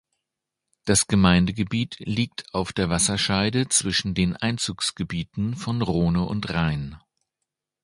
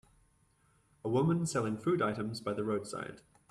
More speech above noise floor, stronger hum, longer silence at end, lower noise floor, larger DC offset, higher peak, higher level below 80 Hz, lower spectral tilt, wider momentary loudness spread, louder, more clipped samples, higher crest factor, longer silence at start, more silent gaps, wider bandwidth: first, 61 dB vs 37 dB; neither; first, 0.85 s vs 0.3 s; first, -84 dBFS vs -70 dBFS; neither; first, -2 dBFS vs -20 dBFS; first, -42 dBFS vs -68 dBFS; second, -4 dB/octave vs -6.5 dB/octave; second, 9 LU vs 12 LU; first, -23 LUFS vs -34 LUFS; neither; first, 22 dB vs 16 dB; second, 0.85 s vs 1.05 s; neither; second, 11.5 kHz vs 13 kHz